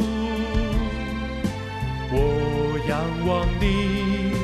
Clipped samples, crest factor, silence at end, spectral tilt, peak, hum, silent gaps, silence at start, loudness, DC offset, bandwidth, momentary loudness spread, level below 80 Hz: under 0.1%; 14 dB; 0 s; -7 dB/octave; -8 dBFS; none; none; 0 s; -24 LUFS; under 0.1%; 14 kHz; 6 LU; -30 dBFS